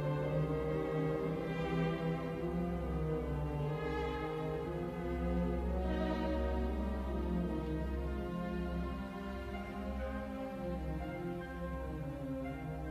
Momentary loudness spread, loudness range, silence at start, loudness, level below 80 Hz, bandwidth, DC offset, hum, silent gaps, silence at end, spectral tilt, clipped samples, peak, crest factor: 7 LU; 5 LU; 0 s; -38 LUFS; -44 dBFS; 14.5 kHz; under 0.1%; none; none; 0 s; -8.5 dB/octave; under 0.1%; -24 dBFS; 14 dB